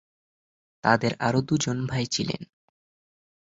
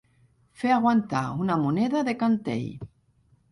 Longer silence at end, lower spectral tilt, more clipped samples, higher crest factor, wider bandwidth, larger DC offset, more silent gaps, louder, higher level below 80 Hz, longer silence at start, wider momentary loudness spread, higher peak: first, 0.95 s vs 0.65 s; second, -4.5 dB/octave vs -7.5 dB/octave; neither; first, 24 dB vs 16 dB; second, 8 kHz vs 11 kHz; neither; neither; about the same, -25 LUFS vs -25 LUFS; about the same, -58 dBFS vs -60 dBFS; first, 0.85 s vs 0.6 s; second, 6 LU vs 13 LU; first, -4 dBFS vs -10 dBFS